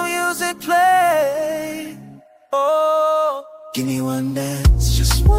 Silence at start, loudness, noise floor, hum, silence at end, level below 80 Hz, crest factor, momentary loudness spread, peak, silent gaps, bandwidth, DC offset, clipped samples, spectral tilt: 0 s; -18 LUFS; -42 dBFS; none; 0 s; -24 dBFS; 14 dB; 12 LU; -4 dBFS; none; 16 kHz; under 0.1%; under 0.1%; -5 dB/octave